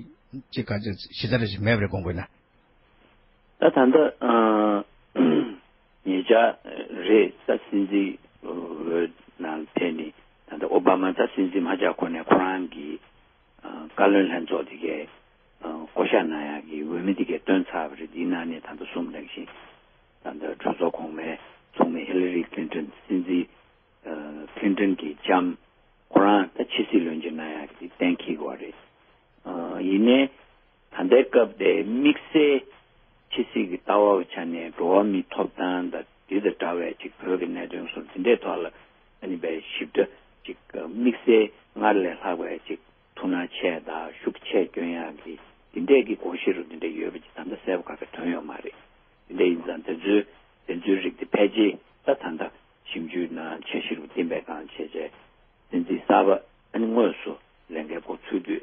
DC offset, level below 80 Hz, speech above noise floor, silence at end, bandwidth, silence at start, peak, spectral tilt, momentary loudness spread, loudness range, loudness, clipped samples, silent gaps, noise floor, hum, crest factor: under 0.1%; -58 dBFS; 36 dB; 0 s; 5.8 kHz; 0 s; -4 dBFS; -10.5 dB/octave; 17 LU; 7 LU; -25 LUFS; under 0.1%; none; -61 dBFS; none; 22 dB